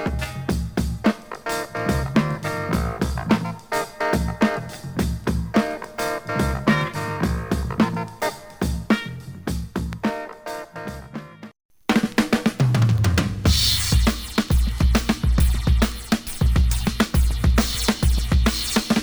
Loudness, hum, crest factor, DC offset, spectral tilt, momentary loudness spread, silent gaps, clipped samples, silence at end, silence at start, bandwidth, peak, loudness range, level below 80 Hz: -22 LUFS; none; 18 dB; 0.2%; -5 dB/octave; 10 LU; 11.65-11.69 s; under 0.1%; 0 s; 0 s; over 20 kHz; -4 dBFS; 6 LU; -26 dBFS